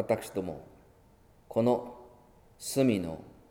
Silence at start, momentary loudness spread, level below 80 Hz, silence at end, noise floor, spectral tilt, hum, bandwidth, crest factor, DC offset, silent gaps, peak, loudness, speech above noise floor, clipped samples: 0 s; 19 LU; -62 dBFS; 0.2 s; -60 dBFS; -6 dB/octave; none; 18.5 kHz; 20 dB; under 0.1%; none; -12 dBFS; -31 LUFS; 30 dB; under 0.1%